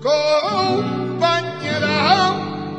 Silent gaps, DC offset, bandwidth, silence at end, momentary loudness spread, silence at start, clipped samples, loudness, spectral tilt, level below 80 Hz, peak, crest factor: none; under 0.1%; 9.8 kHz; 0 s; 7 LU; 0 s; under 0.1%; -18 LUFS; -5 dB/octave; -60 dBFS; -2 dBFS; 16 dB